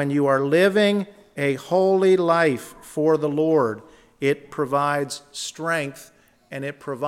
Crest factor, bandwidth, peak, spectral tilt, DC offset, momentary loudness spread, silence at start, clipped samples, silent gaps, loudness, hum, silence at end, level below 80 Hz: 16 dB; 15.5 kHz; -6 dBFS; -5.5 dB/octave; under 0.1%; 14 LU; 0 s; under 0.1%; none; -21 LUFS; none; 0 s; -66 dBFS